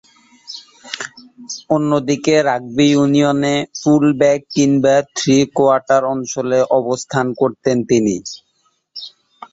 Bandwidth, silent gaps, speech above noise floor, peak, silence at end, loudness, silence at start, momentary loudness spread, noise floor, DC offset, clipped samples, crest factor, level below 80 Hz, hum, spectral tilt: 8 kHz; none; 48 dB; -2 dBFS; 0.1 s; -15 LUFS; 0.5 s; 19 LU; -63 dBFS; under 0.1%; under 0.1%; 14 dB; -56 dBFS; none; -5 dB/octave